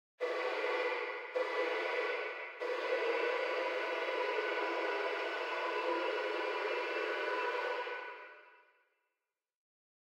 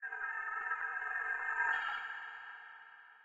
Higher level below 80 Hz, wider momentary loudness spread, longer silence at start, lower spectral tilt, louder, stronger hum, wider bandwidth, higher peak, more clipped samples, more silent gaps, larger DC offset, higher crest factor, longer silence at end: second, under -90 dBFS vs -80 dBFS; second, 5 LU vs 18 LU; first, 0.2 s vs 0 s; about the same, 0 dB/octave vs 0 dB/octave; about the same, -36 LUFS vs -37 LUFS; neither; first, 15 kHz vs 8.2 kHz; about the same, -22 dBFS vs -22 dBFS; neither; neither; neither; about the same, 16 dB vs 18 dB; first, 1.45 s vs 0 s